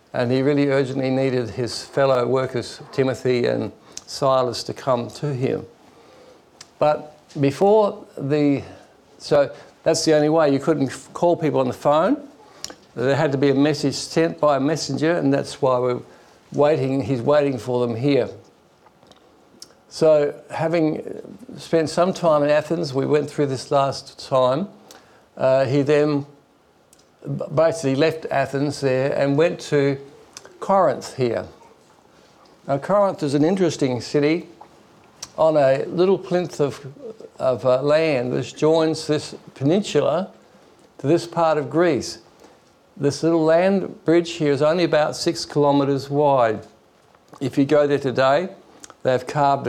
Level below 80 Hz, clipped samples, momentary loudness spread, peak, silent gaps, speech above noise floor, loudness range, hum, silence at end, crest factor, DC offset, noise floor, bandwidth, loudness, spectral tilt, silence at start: -62 dBFS; under 0.1%; 12 LU; -8 dBFS; none; 37 dB; 3 LU; none; 0 s; 14 dB; under 0.1%; -57 dBFS; 13.5 kHz; -20 LUFS; -6 dB/octave; 0.15 s